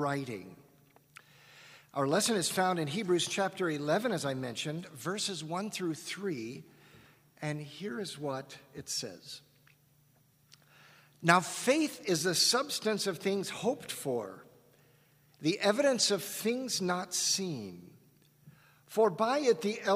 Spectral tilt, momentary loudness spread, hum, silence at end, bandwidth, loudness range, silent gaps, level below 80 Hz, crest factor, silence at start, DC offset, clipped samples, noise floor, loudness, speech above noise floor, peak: -3.5 dB/octave; 15 LU; none; 0 s; 15.5 kHz; 11 LU; none; -78 dBFS; 28 dB; 0 s; under 0.1%; under 0.1%; -67 dBFS; -32 LUFS; 35 dB; -6 dBFS